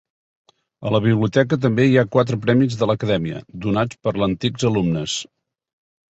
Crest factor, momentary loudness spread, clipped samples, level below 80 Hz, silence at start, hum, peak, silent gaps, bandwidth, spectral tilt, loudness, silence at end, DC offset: 18 dB; 10 LU; under 0.1%; -50 dBFS; 0.8 s; none; -2 dBFS; none; 8.2 kHz; -6.5 dB/octave; -19 LUFS; 0.9 s; under 0.1%